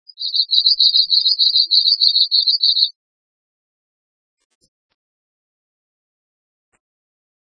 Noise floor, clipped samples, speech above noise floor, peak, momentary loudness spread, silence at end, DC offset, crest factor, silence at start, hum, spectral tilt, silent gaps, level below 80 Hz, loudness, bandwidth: under -90 dBFS; under 0.1%; over 75 dB; 0 dBFS; 6 LU; 4.55 s; under 0.1%; 20 dB; 0.2 s; none; 2.5 dB/octave; none; -82 dBFS; -12 LUFS; 10 kHz